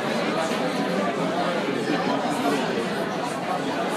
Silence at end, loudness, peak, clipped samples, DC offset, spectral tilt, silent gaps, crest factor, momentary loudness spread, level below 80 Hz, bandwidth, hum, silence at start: 0 s; -25 LUFS; -12 dBFS; under 0.1%; under 0.1%; -5 dB/octave; none; 14 dB; 3 LU; -68 dBFS; 15.5 kHz; none; 0 s